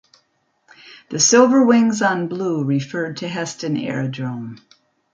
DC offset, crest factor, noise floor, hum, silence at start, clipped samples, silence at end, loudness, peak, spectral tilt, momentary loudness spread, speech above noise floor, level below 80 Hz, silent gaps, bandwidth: under 0.1%; 18 dB; -66 dBFS; none; 0.85 s; under 0.1%; 0.6 s; -18 LUFS; -2 dBFS; -4 dB/octave; 15 LU; 48 dB; -66 dBFS; none; 9.4 kHz